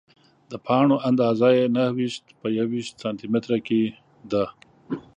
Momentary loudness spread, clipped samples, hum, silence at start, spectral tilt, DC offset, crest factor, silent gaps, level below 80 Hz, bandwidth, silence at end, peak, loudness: 13 LU; under 0.1%; none; 0.5 s; -7 dB/octave; under 0.1%; 18 dB; none; -64 dBFS; 9.8 kHz; 0.15 s; -6 dBFS; -23 LUFS